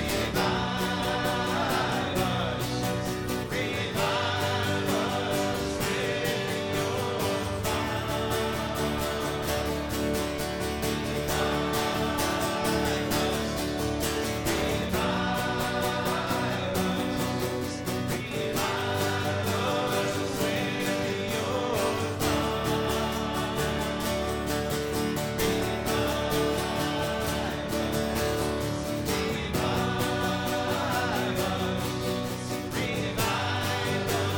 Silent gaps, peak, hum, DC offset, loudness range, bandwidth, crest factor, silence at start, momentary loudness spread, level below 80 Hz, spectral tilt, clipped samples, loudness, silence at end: none; -12 dBFS; none; under 0.1%; 1 LU; 17.5 kHz; 16 dB; 0 s; 3 LU; -44 dBFS; -4.5 dB/octave; under 0.1%; -28 LUFS; 0 s